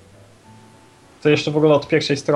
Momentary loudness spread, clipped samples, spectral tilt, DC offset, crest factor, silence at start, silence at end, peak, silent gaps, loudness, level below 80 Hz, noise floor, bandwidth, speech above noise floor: 4 LU; under 0.1%; -5.5 dB/octave; under 0.1%; 16 dB; 1.25 s; 0 s; -2 dBFS; none; -18 LUFS; -58 dBFS; -48 dBFS; 11 kHz; 32 dB